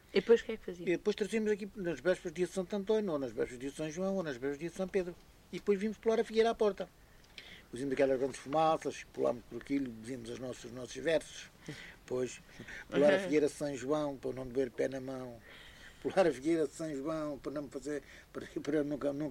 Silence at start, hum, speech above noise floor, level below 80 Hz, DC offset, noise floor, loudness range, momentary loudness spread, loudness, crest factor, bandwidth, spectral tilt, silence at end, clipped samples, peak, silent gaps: 0.1 s; none; 20 dB; -62 dBFS; under 0.1%; -55 dBFS; 3 LU; 18 LU; -35 LUFS; 20 dB; 16 kHz; -5.5 dB/octave; 0 s; under 0.1%; -14 dBFS; none